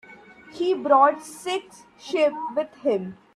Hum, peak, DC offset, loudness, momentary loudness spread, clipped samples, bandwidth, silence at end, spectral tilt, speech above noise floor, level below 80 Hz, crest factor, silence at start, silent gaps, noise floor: none; -4 dBFS; under 0.1%; -23 LUFS; 13 LU; under 0.1%; 14 kHz; 0.2 s; -4.5 dB/octave; 24 dB; -72 dBFS; 20 dB; 0.1 s; none; -47 dBFS